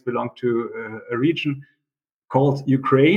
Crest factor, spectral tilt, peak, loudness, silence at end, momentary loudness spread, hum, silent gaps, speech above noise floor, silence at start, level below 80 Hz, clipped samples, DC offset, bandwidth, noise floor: 18 dB; -8.5 dB/octave; -4 dBFS; -22 LUFS; 0 s; 11 LU; none; 2.12-2.22 s; 66 dB; 0.05 s; -68 dBFS; under 0.1%; under 0.1%; 7 kHz; -86 dBFS